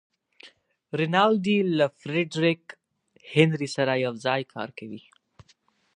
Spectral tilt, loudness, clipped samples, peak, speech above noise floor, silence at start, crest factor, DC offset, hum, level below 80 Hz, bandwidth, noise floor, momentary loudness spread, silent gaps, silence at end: -6 dB/octave; -25 LUFS; under 0.1%; -4 dBFS; 40 dB; 0.45 s; 24 dB; under 0.1%; none; -72 dBFS; 10.5 kHz; -64 dBFS; 15 LU; none; 0.95 s